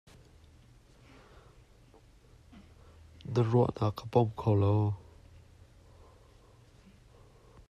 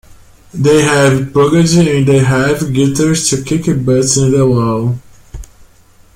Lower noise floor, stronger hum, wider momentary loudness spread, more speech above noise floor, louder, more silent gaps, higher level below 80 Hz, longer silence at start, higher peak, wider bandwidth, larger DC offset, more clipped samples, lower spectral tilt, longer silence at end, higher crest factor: first, -59 dBFS vs -44 dBFS; neither; about the same, 8 LU vs 6 LU; about the same, 31 dB vs 34 dB; second, -30 LUFS vs -11 LUFS; neither; second, -60 dBFS vs -38 dBFS; first, 3.25 s vs 0.1 s; second, -14 dBFS vs 0 dBFS; second, 7.2 kHz vs 16 kHz; neither; neither; first, -9 dB/octave vs -5.5 dB/octave; first, 2.7 s vs 0.7 s; first, 20 dB vs 12 dB